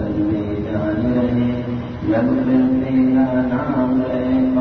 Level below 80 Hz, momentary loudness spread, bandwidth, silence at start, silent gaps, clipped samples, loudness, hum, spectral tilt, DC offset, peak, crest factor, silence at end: -40 dBFS; 6 LU; 4.9 kHz; 0 s; none; under 0.1%; -18 LUFS; none; -10 dB/octave; 0.2%; -6 dBFS; 12 dB; 0 s